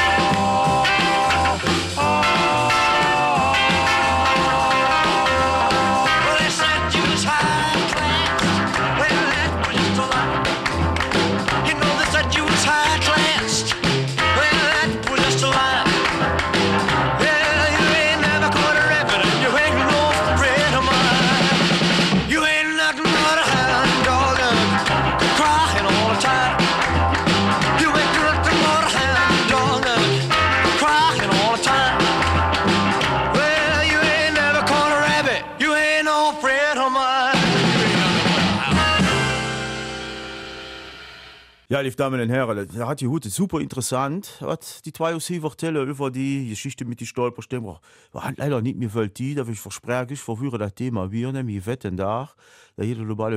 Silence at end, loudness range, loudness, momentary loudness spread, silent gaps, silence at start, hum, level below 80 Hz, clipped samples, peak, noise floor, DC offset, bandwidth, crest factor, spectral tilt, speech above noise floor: 0 s; 10 LU; -18 LUFS; 11 LU; none; 0 s; none; -38 dBFS; under 0.1%; -6 dBFS; -46 dBFS; under 0.1%; 15 kHz; 12 dB; -4 dB/octave; 20 dB